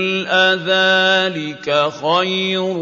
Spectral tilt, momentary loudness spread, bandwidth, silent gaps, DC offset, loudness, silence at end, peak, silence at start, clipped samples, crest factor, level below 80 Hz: -4 dB/octave; 6 LU; 7.6 kHz; none; under 0.1%; -15 LUFS; 0 s; -2 dBFS; 0 s; under 0.1%; 16 dB; -68 dBFS